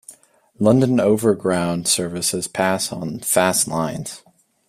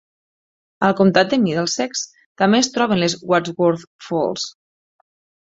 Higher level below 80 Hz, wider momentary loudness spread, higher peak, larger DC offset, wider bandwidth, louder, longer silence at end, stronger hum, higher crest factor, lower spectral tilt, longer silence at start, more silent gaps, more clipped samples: about the same, -56 dBFS vs -60 dBFS; about the same, 10 LU vs 12 LU; about the same, -2 dBFS vs -2 dBFS; neither; first, 16 kHz vs 8 kHz; about the same, -19 LUFS vs -18 LUFS; second, 0.5 s vs 1 s; neither; about the same, 18 dB vs 18 dB; about the same, -4 dB/octave vs -4.5 dB/octave; second, 0.1 s vs 0.8 s; second, none vs 2.26-2.35 s, 3.87-3.99 s; neither